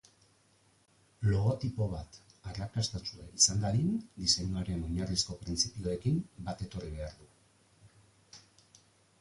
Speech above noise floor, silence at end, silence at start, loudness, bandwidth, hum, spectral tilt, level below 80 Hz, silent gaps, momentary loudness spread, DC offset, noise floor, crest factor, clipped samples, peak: 35 dB; 0.8 s; 1.2 s; -32 LUFS; 11.5 kHz; none; -4 dB/octave; -50 dBFS; none; 16 LU; under 0.1%; -68 dBFS; 26 dB; under 0.1%; -10 dBFS